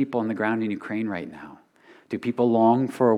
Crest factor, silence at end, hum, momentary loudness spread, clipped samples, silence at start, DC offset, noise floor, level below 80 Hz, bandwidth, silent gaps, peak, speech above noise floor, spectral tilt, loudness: 16 dB; 0 s; none; 18 LU; under 0.1%; 0 s; under 0.1%; -54 dBFS; -72 dBFS; 11.5 kHz; none; -8 dBFS; 31 dB; -8 dB/octave; -24 LUFS